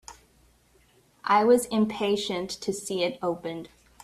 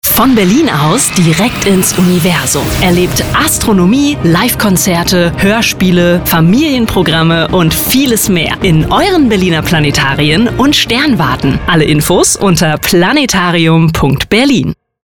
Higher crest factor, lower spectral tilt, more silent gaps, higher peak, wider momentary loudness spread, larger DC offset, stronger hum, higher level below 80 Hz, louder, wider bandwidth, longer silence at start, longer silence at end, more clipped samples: first, 18 dB vs 8 dB; about the same, -4.5 dB/octave vs -4.5 dB/octave; neither; second, -8 dBFS vs 0 dBFS; first, 14 LU vs 2 LU; second, under 0.1% vs 0.7%; neither; second, -62 dBFS vs -28 dBFS; second, -26 LUFS vs -9 LUFS; second, 15 kHz vs over 20 kHz; about the same, 0.1 s vs 0.05 s; about the same, 0.35 s vs 0.35 s; neither